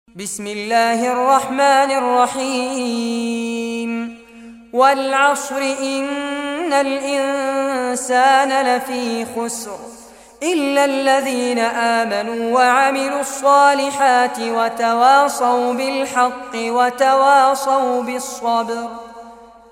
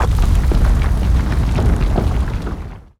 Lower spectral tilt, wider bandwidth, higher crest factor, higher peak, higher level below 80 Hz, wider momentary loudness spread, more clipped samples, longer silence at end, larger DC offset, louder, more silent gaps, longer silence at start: second, -2.5 dB/octave vs -7 dB/octave; first, 16.5 kHz vs 13 kHz; about the same, 16 dB vs 12 dB; about the same, -2 dBFS vs -2 dBFS; second, -60 dBFS vs -16 dBFS; first, 12 LU vs 8 LU; neither; about the same, 0.25 s vs 0.2 s; neither; about the same, -17 LUFS vs -18 LUFS; neither; first, 0.15 s vs 0 s